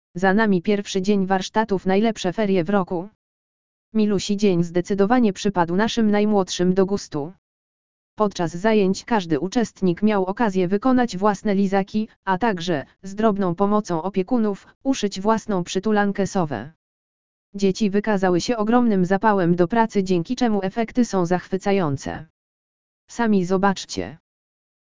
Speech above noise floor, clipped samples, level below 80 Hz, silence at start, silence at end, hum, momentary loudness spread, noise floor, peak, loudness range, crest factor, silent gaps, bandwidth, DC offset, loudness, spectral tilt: over 70 dB; under 0.1%; -50 dBFS; 0.15 s; 0.7 s; none; 8 LU; under -90 dBFS; -2 dBFS; 3 LU; 18 dB; 3.15-3.92 s, 7.38-8.17 s, 12.16-12.23 s, 14.75-14.81 s, 16.76-17.53 s, 22.30-23.08 s; 7.6 kHz; 2%; -21 LUFS; -6 dB/octave